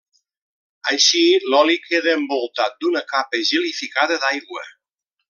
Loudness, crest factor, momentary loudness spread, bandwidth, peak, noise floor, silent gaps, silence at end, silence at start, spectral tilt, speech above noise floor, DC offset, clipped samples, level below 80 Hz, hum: -18 LUFS; 18 dB; 9 LU; 7.2 kHz; -2 dBFS; -79 dBFS; none; 0.6 s; 0.85 s; 0.5 dB/octave; 60 dB; under 0.1%; under 0.1%; -80 dBFS; none